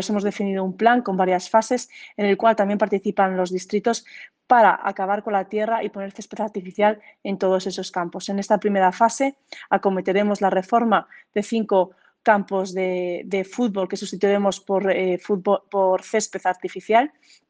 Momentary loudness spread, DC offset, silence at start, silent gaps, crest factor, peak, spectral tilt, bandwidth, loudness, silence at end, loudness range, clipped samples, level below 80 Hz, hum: 10 LU; under 0.1%; 0 s; none; 18 dB; -2 dBFS; -5 dB/octave; 9.8 kHz; -22 LUFS; 0.4 s; 3 LU; under 0.1%; -70 dBFS; none